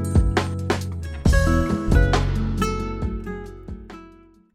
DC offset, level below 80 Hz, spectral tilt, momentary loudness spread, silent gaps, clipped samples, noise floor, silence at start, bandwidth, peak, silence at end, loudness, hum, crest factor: under 0.1%; -26 dBFS; -6.5 dB/octave; 19 LU; none; under 0.1%; -49 dBFS; 0 s; 14 kHz; -4 dBFS; 0.45 s; -22 LUFS; none; 18 dB